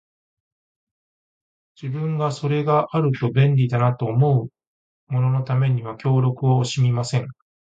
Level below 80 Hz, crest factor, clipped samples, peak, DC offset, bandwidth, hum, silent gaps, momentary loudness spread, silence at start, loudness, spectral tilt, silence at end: -56 dBFS; 16 dB; under 0.1%; -4 dBFS; under 0.1%; 8 kHz; none; 4.67-5.07 s; 8 LU; 1.8 s; -21 LUFS; -7.5 dB/octave; 0.35 s